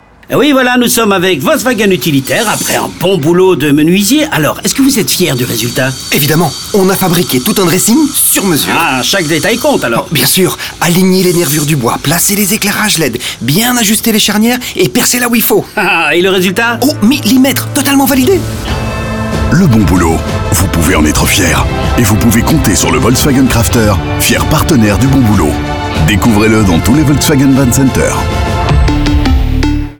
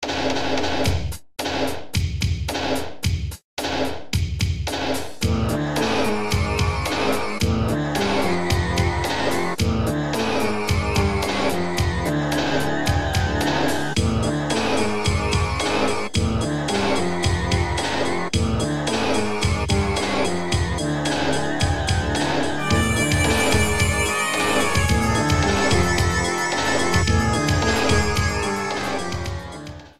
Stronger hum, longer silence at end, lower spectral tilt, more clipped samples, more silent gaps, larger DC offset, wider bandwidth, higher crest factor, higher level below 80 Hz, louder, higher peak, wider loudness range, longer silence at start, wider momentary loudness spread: neither; about the same, 0.05 s vs 0 s; about the same, -4.5 dB/octave vs -4.5 dB/octave; neither; second, none vs 3.44-3.57 s; second, 0.7% vs 2%; first, over 20 kHz vs 16 kHz; second, 8 dB vs 16 dB; first, -22 dBFS vs -32 dBFS; first, -9 LUFS vs -22 LUFS; first, 0 dBFS vs -4 dBFS; second, 1 LU vs 5 LU; first, 0.3 s vs 0 s; about the same, 4 LU vs 6 LU